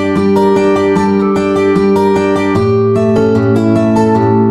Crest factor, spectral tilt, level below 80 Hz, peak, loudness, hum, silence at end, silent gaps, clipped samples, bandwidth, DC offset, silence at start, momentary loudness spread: 10 dB; -8 dB/octave; -44 dBFS; 0 dBFS; -11 LUFS; none; 0 s; none; under 0.1%; 11.5 kHz; under 0.1%; 0 s; 2 LU